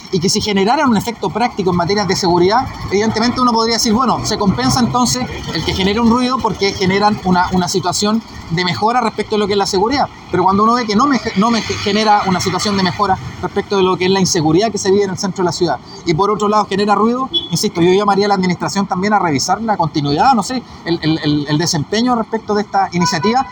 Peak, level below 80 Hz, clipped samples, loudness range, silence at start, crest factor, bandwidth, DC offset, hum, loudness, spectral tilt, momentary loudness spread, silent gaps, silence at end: 0 dBFS; -40 dBFS; under 0.1%; 1 LU; 0 s; 14 dB; 19 kHz; under 0.1%; none; -15 LUFS; -4.5 dB/octave; 5 LU; none; 0 s